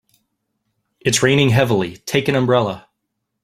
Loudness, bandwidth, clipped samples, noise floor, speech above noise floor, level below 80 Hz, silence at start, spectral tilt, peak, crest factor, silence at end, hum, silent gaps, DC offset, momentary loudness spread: -17 LUFS; 16 kHz; under 0.1%; -76 dBFS; 60 dB; -52 dBFS; 1.05 s; -4.5 dB/octave; -2 dBFS; 18 dB; 0.65 s; none; none; under 0.1%; 10 LU